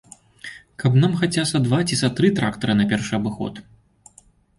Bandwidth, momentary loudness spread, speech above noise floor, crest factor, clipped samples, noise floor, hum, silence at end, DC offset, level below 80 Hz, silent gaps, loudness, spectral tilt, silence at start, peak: 11.5 kHz; 17 LU; 35 dB; 16 dB; under 0.1%; -54 dBFS; none; 0.95 s; under 0.1%; -52 dBFS; none; -20 LUFS; -5.5 dB/octave; 0.45 s; -6 dBFS